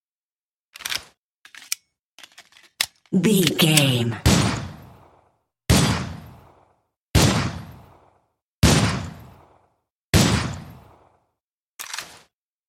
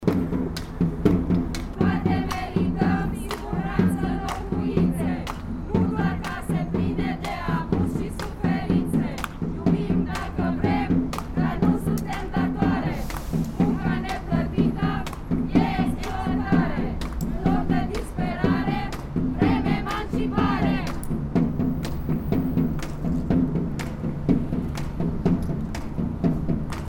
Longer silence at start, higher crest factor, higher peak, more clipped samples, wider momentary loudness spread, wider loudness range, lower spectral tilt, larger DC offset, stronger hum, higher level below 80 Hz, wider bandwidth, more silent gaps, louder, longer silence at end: first, 0.8 s vs 0 s; about the same, 22 dB vs 20 dB; about the same, -2 dBFS vs -4 dBFS; neither; first, 20 LU vs 7 LU; first, 6 LU vs 1 LU; second, -4 dB/octave vs -7.5 dB/octave; neither; neither; about the same, -36 dBFS vs -34 dBFS; about the same, 16.5 kHz vs 16.5 kHz; first, 1.18-1.42 s, 1.99-2.18 s, 6.96-7.09 s, 8.42-8.62 s, 9.90-10.13 s, 11.43-11.78 s vs none; first, -21 LUFS vs -25 LUFS; first, 0.65 s vs 0 s